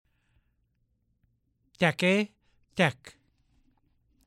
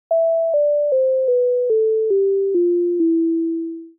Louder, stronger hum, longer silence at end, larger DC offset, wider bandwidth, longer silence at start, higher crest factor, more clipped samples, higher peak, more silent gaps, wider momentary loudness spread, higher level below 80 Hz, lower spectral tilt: second, -27 LUFS vs -18 LUFS; neither; first, 1.2 s vs 0.1 s; neither; first, 14.5 kHz vs 0.9 kHz; first, 1.8 s vs 0.1 s; first, 24 dB vs 6 dB; neither; about the same, -10 dBFS vs -12 dBFS; neither; first, 11 LU vs 2 LU; first, -68 dBFS vs -82 dBFS; first, -5.5 dB/octave vs 8 dB/octave